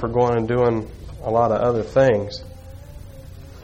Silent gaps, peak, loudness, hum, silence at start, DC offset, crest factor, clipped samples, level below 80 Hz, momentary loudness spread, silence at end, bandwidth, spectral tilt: none; -6 dBFS; -20 LUFS; none; 0 s; under 0.1%; 16 dB; under 0.1%; -40 dBFS; 23 LU; 0 s; 10.5 kHz; -7.5 dB/octave